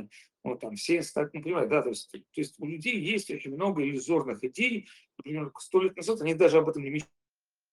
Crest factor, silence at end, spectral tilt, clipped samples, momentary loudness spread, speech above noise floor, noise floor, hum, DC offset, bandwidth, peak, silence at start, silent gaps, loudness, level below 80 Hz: 20 dB; 0.7 s; -5 dB/octave; under 0.1%; 13 LU; over 61 dB; under -90 dBFS; none; under 0.1%; 12.5 kHz; -10 dBFS; 0 s; none; -29 LUFS; -74 dBFS